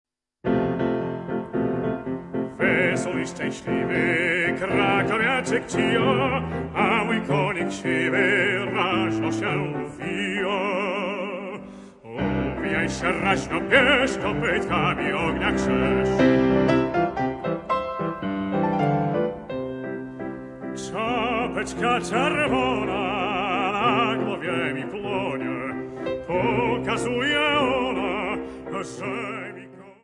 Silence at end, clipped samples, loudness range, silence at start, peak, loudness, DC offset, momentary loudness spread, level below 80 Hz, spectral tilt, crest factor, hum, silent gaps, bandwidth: 0.1 s; under 0.1%; 5 LU; 0.45 s; -4 dBFS; -24 LUFS; under 0.1%; 11 LU; -48 dBFS; -5.5 dB/octave; 20 dB; none; none; 11 kHz